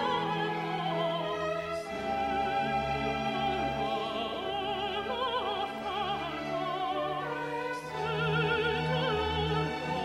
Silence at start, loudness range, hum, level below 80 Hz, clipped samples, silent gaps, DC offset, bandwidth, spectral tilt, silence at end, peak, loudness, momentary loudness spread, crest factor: 0 s; 2 LU; none; -52 dBFS; under 0.1%; none; under 0.1%; 13.5 kHz; -5.5 dB/octave; 0 s; -18 dBFS; -32 LUFS; 5 LU; 14 dB